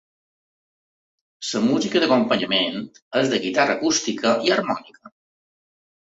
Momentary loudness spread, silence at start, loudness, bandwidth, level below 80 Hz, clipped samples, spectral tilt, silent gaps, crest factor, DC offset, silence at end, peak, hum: 9 LU; 1.4 s; -21 LUFS; 8 kHz; -66 dBFS; under 0.1%; -3.5 dB/octave; 3.02-3.11 s; 18 dB; under 0.1%; 1.05 s; -4 dBFS; none